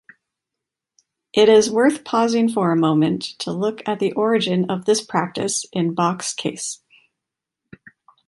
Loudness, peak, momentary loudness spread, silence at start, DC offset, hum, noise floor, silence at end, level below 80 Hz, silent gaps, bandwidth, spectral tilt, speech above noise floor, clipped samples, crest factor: -19 LUFS; -2 dBFS; 11 LU; 1.35 s; under 0.1%; none; -84 dBFS; 1.55 s; -64 dBFS; none; 11.5 kHz; -4.5 dB/octave; 66 dB; under 0.1%; 18 dB